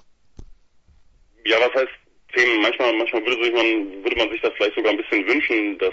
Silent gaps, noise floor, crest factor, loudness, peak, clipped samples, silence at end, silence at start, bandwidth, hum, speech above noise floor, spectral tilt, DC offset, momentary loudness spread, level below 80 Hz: none; -54 dBFS; 18 dB; -20 LUFS; -4 dBFS; under 0.1%; 0 s; 0.4 s; 7.8 kHz; none; 34 dB; -3 dB/octave; under 0.1%; 6 LU; -52 dBFS